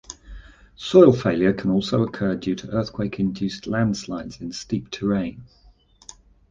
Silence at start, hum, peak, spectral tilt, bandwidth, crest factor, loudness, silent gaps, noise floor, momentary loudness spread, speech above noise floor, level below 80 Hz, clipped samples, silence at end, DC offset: 0.1 s; none; -2 dBFS; -6.5 dB/octave; 7.6 kHz; 20 dB; -22 LUFS; none; -54 dBFS; 17 LU; 33 dB; -48 dBFS; under 0.1%; 1.05 s; under 0.1%